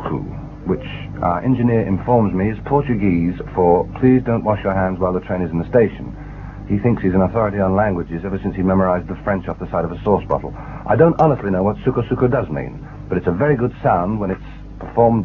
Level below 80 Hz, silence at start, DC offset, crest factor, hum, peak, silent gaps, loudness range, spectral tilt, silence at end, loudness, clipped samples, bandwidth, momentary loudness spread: -36 dBFS; 0 s; under 0.1%; 18 dB; none; 0 dBFS; none; 2 LU; -10.5 dB/octave; 0 s; -18 LUFS; under 0.1%; 6 kHz; 12 LU